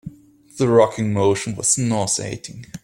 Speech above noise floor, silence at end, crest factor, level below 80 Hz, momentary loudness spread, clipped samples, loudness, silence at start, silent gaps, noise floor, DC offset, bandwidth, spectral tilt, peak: 21 dB; 0.05 s; 18 dB; -54 dBFS; 16 LU; under 0.1%; -19 LUFS; 0.05 s; none; -40 dBFS; under 0.1%; 16.5 kHz; -4.5 dB/octave; -2 dBFS